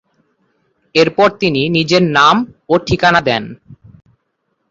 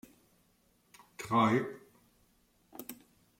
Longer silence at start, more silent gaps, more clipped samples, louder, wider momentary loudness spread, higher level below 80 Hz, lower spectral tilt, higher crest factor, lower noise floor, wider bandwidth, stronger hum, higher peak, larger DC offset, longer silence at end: second, 0.95 s vs 1.2 s; neither; neither; first, -13 LUFS vs -31 LUFS; second, 8 LU vs 26 LU; first, -44 dBFS vs -74 dBFS; about the same, -5 dB/octave vs -6 dB/octave; second, 16 dB vs 22 dB; about the same, -68 dBFS vs -71 dBFS; second, 8 kHz vs 16.5 kHz; neither; first, 0 dBFS vs -14 dBFS; neither; first, 0.95 s vs 0.45 s